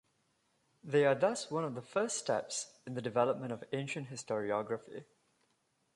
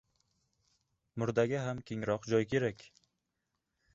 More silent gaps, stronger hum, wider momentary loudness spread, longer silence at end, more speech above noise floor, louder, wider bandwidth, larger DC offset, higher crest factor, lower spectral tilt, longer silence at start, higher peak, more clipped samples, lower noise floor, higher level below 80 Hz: neither; neither; first, 12 LU vs 8 LU; second, 0.9 s vs 1.15 s; second, 43 dB vs 52 dB; about the same, -35 LUFS vs -34 LUFS; first, 11.5 kHz vs 7.8 kHz; neither; about the same, 20 dB vs 20 dB; second, -4.5 dB/octave vs -6 dB/octave; second, 0.85 s vs 1.15 s; about the same, -16 dBFS vs -16 dBFS; neither; second, -78 dBFS vs -85 dBFS; second, -80 dBFS vs -66 dBFS